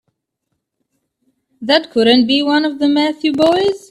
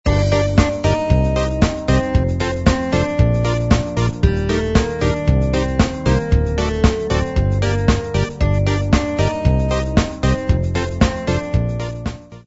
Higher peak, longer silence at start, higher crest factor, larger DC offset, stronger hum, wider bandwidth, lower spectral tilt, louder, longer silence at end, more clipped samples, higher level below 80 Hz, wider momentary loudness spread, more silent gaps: about the same, 0 dBFS vs 0 dBFS; first, 1.6 s vs 0.05 s; about the same, 16 dB vs 16 dB; neither; neither; first, 12 kHz vs 8 kHz; second, -4.5 dB/octave vs -6.5 dB/octave; first, -14 LUFS vs -18 LUFS; about the same, 0.15 s vs 0.05 s; neither; second, -58 dBFS vs -22 dBFS; about the same, 5 LU vs 3 LU; neither